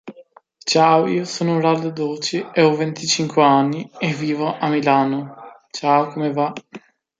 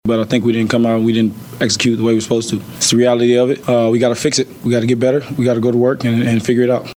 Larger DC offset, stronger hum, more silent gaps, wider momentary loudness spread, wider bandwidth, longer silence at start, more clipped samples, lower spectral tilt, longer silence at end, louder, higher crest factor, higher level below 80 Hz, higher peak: neither; neither; neither; first, 10 LU vs 5 LU; second, 9.4 kHz vs 19 kHz; about the same, 0.05 s vs 0.05 s; neither; about the same, -5 dB/octave vs -5 dB/octave; first, 0.4 s vs 0.05 s; second, -19 LUFS vs -15 LUFS; about the same, 18 dB vs 14 dB; second, -68 dBFS vs -52 dBFS; about the same, -2 dBFS vs 0 dBFS